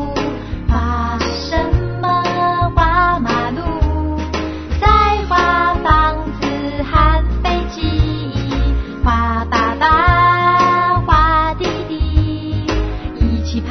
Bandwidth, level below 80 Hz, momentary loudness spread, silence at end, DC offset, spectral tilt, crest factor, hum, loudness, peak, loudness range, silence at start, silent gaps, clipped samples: 6.4 kHz; -20 dBFS; 9 LU; 0 s; under 0.1%; -6.5 dB/octave; 14 dB; none; -16 LUFS; 0 dBFS; 3 LU; 0 s; none; under 0.1%